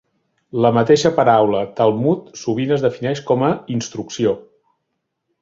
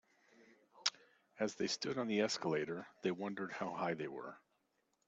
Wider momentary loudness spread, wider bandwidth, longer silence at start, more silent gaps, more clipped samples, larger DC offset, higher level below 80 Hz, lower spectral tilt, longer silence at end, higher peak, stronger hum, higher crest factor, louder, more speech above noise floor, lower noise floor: first, 11 LU vs 8 LU; about the same, 7.8 kHz vs 8.2 kHz; first, 0.55 s vs 0.4 s; neither; neither; neither; first, -56 dBFS vs -84 dBFS; first, -6 dB/octave vs -4 dB/octave; first, 1 s vs 0.7 s; first, 0 dBFS vs -14 dBFS; neither; second, 18 dB vs 28 dB; first, -18 LUFS vs -40 LUFS; first, 58 dB vs 42 dB; second, -74 dBFS vs -81 dBFS